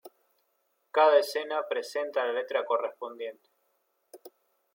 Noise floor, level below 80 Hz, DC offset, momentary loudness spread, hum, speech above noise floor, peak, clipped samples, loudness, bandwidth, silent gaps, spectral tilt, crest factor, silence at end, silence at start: -75 dBFS; under -90 dBFS; under 0.1%; 16 LU; none; 47 dB; -10 dBFS; under 0.1%; -28 LUFS; 16.5 kHz; none; -1 dB/octave; 20 dB; 0.45 s; 0.05 s